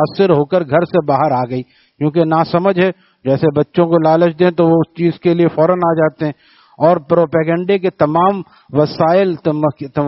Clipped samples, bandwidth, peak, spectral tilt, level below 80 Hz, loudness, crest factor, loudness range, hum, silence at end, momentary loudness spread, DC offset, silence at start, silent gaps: under 0.1%; 5.8 kHz; 0 dBFS; -6.5 dB/octave; -54 dBFS; -14 LUFS; 14 dB; 2 LU; none; 0 s; 6 LU; under 0.1%; 0 s; none